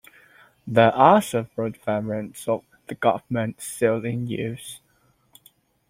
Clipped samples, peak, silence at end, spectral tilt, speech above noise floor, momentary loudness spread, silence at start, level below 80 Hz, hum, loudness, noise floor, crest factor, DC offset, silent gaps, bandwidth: under 0.1%; -2 dBFS; 1.1 s; -6 dB/octave; 41 dB; 18 LU; 0.65 s; -62 dBFS; none; -23 LUFS; -63 dBFS; 22 dB; under 0.1%; none; 16.5 kHz